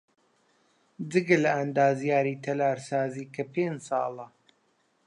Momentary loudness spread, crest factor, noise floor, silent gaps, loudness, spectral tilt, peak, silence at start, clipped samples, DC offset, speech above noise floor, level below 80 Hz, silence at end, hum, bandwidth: 12 LU; 20 dB; -70 dBFS; none; -27 LUFS; -6.5 dB/octave; -8 dBFS; 1 s; under 0.1%; under 0.1%; 43 dB; -80 dBFS; 0.8 s; none; 11 kHz